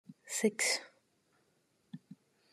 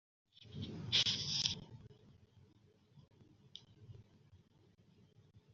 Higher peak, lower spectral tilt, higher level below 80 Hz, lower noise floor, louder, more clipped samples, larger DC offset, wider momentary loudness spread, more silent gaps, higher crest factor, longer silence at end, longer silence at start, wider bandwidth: second, -18 dBFS vs -14 dBFS; about the same, -2 dB/octave vs -1.5 dB/octave; second, under -90 dBFS vs -74 dBFS; first, -75 dBFS vs -69 dBFS; first, -33 LUFS vs -36 LUFS; neither; neither; second, 23 LU vs 27 LU; neither; second, 22 dB vs 32 dB; first, 0.4 s vs 0.15 s; second, 0.1 s vs 0.4 s; first, 13 kHz vs 7.4 kHz